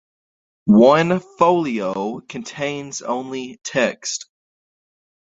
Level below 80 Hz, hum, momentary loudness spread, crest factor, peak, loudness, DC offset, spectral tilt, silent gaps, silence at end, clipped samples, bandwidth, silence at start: -60 dBFS; none; 16 LU; 18 dB; -2 dBFS; -19 LUFS; under 0.1%; -5 dB/octave; none; 1 s; under 0.1%; 8 kHz; 0.65 s